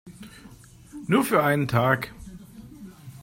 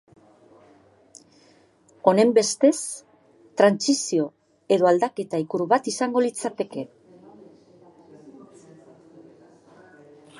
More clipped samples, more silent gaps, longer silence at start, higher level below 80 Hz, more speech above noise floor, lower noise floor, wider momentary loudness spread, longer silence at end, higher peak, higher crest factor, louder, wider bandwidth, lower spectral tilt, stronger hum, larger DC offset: neither; neither; second, 0.05 s vs 2.05 s; first, -54 dBFS vs -76 dBFS; second, 21 dB vs 36 dB; second, -44 dBFS vs -57 dBFS; first, 23 LU vs 14 LU; second, 0.05 s vs 2.1 s; second, -6 dBFS vs -2 dBFS; about the same, 22 dB vs 22 dB; about the same, -23 LUFS vs -22 LUFS; first, 16.5 kHz vs 11.5 kHz; first, -6 dB/octave vs -4 dB/octave; neither; neither